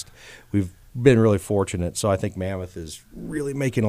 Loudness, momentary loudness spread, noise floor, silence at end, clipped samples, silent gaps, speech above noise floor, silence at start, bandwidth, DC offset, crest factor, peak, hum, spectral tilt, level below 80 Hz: -23 LUFS; 18 LU; -45 dBFS; 0 s; under 0.1%; none; 22 dB; 0 s; 16 kHz; under 0.1%; 20 dB; -4 dBFS; none; -6.5 dB/octave; -48 dBFS